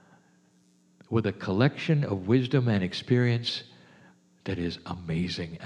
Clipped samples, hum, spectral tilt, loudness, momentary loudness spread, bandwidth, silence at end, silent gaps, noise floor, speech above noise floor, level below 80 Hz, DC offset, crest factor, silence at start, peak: under 0.1%; none; -7 dB/octave; -28 LUFS; 10 LU; 9.6 kHz; 0 s; none; -63 dBFS; 36 dB; -58 dBFS; under 0.1%; 20 dB; 1.1 s; -8 dBFS